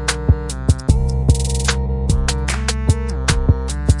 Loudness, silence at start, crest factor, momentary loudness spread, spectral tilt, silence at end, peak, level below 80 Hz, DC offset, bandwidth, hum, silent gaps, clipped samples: -18 LUFS; 0 s; 16 dB; 3 LU; -5 dB/octave; 0 s; 0 dBFS; -20 dBFS; under 0.1%; 11.5 kHz; none; none; under 0.1%